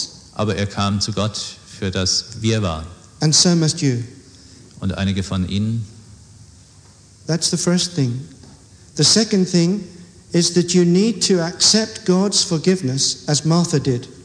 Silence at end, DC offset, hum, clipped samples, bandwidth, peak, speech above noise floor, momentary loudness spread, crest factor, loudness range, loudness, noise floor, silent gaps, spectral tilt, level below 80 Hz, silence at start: 0 s; under 0.1%; none; under 0.1%; 10.5 kHz; -2 dBFS; 29 dB; 14 LU; 18 dB; 7 LU; -18 LUFS; -47 dBFS; none; -4 dB/octave; -48 dBFS; 0 s